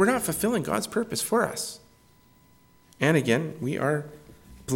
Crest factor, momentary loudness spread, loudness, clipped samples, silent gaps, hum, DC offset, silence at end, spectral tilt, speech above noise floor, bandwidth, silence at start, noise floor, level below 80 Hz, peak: 18 dB; 12 LU; -26 LUFS; under 0.1%; none; none; under 0.1%; 0 s; -4.5 dB/octave; 33 dB; 17.5 kHz; 0 s; -58 dBFS; -58 dBFS; -8 dBFS